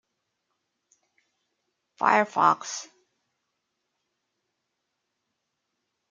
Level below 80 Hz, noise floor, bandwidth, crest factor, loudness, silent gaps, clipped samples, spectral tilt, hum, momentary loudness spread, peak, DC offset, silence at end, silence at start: -84 dBFS; -81 dBFS; 9.6 kHz; 28 dB; -23 LUFS; none; under 0.1%; -3 dB/octave; none; 14 LU; -4 dBFS; under 0.1%; 3.25 s; 2 s